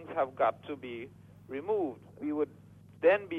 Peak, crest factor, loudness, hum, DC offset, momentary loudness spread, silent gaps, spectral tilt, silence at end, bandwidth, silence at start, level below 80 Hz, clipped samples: -14 dBFS; 20 dB; -33 LUFS; none; under 0.1%; 15 LU; none; -7.5 dB/octave; 0 s; 4.2 kHz; 0 s; -74 dBFS; under 0.1%